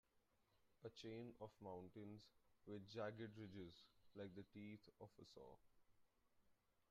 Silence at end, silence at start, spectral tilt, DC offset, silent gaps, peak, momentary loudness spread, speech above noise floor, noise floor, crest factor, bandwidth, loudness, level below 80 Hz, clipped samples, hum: 0.1 s; 0.15 s; -5.5 dB/octave; under 0.1%; none; -38 dBFS; 12 LU; 26 dB; -83 dBFS; 20 dB; 7.4 kHz; -59 LUFS; -86 dBFS; under 0.1%; none